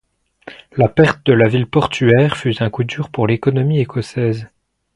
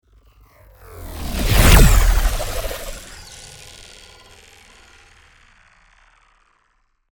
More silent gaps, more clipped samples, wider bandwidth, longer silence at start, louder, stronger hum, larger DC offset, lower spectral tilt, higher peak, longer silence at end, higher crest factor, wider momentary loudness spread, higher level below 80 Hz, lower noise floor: neither; neither; second, 11 kHz vs over 20 kHz; second, 0.45 s vs 0.95 s; about the same, -16 LUFS vs -17 LUFS; neither; neither; first, -7.5 dB/octave vs -4 dB/octave; about the same, 0 dBFS vs 0 dBFS; second, 0.5 s vs 3.7 s; about the same, 16 dB vs 18 dB; second, 9 LU vs 28 LU; second, -46 dBFS vs -22 dBFS; second, -40 dBFS vs -64 dBFS